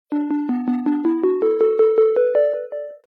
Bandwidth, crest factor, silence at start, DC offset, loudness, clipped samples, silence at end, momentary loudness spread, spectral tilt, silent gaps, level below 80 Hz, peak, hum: 4.2 kHz; 12 dB; 0.1 s; under 0.1%; -18 LUFS; under 0.1%; 0.1 s; 7 LU; -8.5 dB/octave; none; -82 dBFS; -6 dBFS; none